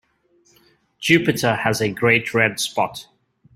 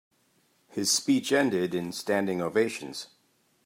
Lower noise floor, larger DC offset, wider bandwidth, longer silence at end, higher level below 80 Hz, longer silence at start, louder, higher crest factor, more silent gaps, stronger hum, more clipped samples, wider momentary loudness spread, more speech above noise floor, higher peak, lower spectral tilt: second, -60 dBFS vs -68 dBFS; neither; about the same, 16 kHz vs 16 kHz; about the same, 0.55 s vs 0.6 s; first, -56 dBFS vs -76 dBFS; first, 1 s vs 0.75 s; first, -19 LUFS vs -27 LUFS; about the same, 20 dB vs 18 dB; neither; neither; neither; second, 9 LU vs 15 LU; about the same, 41 dB vs 41 dB; first, -2 dBFS vs -12 dBFS; about the same, -4.5 dB/octave vs -3.5 dB/octave